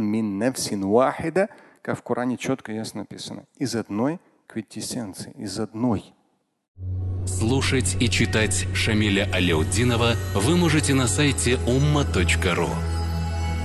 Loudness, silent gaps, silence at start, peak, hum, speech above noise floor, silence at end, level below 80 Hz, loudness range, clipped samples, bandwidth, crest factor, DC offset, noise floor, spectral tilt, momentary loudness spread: -23 LUFS; 6.68-6.75 s; 0 s; -6 dBFS; none; 46 dB; 0 s; -34 dBFS; 9 LU; under 0.1%; 12.5 kHz; 18 dB; under 0.1%; -68 dBFS; -5 dB/octave; 13 LU